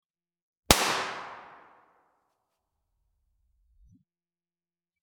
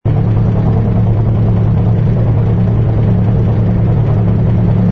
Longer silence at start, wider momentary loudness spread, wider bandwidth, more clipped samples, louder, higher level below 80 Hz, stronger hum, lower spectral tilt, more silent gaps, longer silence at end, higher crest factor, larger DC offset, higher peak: first, 0.7 s vs 0.05 s; first, 22 LU vs 1 LU; first, 17.5 kHz vs 3.7 kHz; neither; second, -25 LUFS vs -12 LUFS; second, -50 dBFS vs -22 dBFS; neither; second, -2 dB/octave vs -11.5 dB/octave; neither; first, 3.55 s vs 0 s; first, 34 dB vs 10 dB; neither; about the same, 0 dBFS vs 0 dBFS